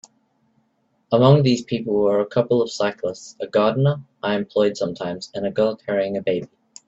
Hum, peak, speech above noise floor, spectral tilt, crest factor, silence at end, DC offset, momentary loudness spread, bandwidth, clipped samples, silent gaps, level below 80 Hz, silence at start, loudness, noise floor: none; -2 dBFS; 47 dB; -7 dB/octave; 20 dB; 0.4 s; under 0.1%; 12 LU; 8 kHz; under 0.1%; none; -60 dBFS; 1.1 s; -21 LUFS; -67 dBFS